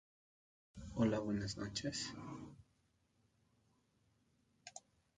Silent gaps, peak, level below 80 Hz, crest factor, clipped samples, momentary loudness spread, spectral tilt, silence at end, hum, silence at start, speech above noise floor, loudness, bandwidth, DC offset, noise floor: none; -24 dBFS; -66 dBFS; 22 dB; under 0.1%; 21 LU; -5 dB/octave; 0.4 s; none; 0.75 s; 38 dB; -41 LUFS; 9.6 kHz; under 0.1%; -78 dBFS